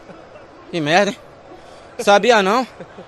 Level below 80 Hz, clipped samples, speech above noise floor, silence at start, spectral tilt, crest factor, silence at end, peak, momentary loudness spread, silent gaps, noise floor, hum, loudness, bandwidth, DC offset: -58 dBFS; under 0.1%; 25 dB; 0.1 s; -4 dB/octave; 18 dB; 0.05 s; 0 dBFS; 19 LU; none; -41 dBFS; none; -16 LUFS; 13.5 kHz; under 0.1%